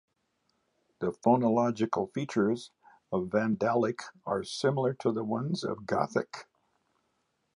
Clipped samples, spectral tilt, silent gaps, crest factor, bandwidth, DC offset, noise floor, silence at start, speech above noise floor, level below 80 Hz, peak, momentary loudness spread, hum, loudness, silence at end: under 0.1%; -6.5 dB/octave; none; 20 dB; 11 kHz; under 0.1%; -77 dBFS; 1 s; 48 dB; -68 dBFS; -10 dBFS; 10 LU; none; -30 LUFS; 1.15 s